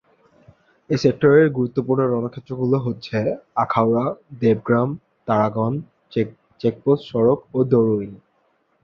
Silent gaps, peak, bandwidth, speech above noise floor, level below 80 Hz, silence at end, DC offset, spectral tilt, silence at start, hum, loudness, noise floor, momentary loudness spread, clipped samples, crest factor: none; -2 dBFS; 7 kHz; 45 dB; -56 dBFS; 0.65 s; under 0.1%; -8.5 dB/octave; 0.9 s; none; -20 LUFS; -65 dBFS; 9 LU; under 0.1%; 18 dB